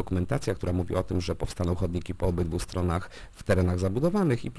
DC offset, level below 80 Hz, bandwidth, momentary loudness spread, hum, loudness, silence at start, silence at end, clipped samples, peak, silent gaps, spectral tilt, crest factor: under 0.1%; -40 dBFS; 11 kHz; 6 LU; none; -28 LUFS; 0 s; 0 s; under 0.1%; -10 dBFS; none; -7 dB/octave; 18 dB